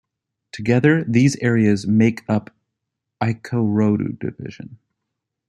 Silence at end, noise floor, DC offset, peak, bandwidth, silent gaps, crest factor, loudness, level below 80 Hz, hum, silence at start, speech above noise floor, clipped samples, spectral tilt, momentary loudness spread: 0.75 s; -80 dBFS; under 0.1%; -2 dBFS; 11 kHz; none; 18 dB; -19 LUFS; -58 dBFS; none; 0.55 s; 62 dB; under 0.1%; -7 dB/octave; 18 LU